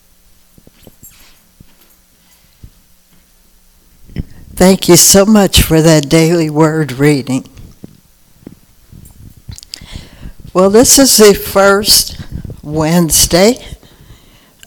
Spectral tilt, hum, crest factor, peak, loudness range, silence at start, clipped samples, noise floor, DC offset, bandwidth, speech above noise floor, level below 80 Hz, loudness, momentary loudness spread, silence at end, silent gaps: -3.5 dB/octave; none; 12 dB; 0 dBFS; 10 LU; 4.15 s; 0.9%; -48 dBFS; under 0.1%; over 20 kHz; 40 dB; -30 dBFS; -8 LUFS; 23 LU; 0.9 s; none